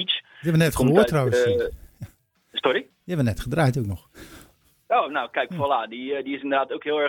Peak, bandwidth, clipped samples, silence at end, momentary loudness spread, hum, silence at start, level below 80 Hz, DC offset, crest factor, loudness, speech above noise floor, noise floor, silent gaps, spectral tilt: -2 dBFS; 18 kHz; under 0.1%; 0 s; 13 LU; none; 0 s; -46 dBFS; under 0.1%; 22 dB; -23 LUFS; 33 dB; -55 dBFS; none; -6 dB/octave